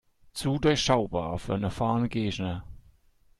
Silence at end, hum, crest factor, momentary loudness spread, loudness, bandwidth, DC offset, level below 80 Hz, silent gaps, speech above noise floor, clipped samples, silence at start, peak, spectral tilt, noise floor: 0.6 s; none; 20 dB; 10 LU; -28 LUFS; 13 kHz; under 0.1%; -48 dBFS; none; 34 dB; under 0.1%; 0.35 s; -8 dBFS; -5.5 dB/octave; -61 dBFS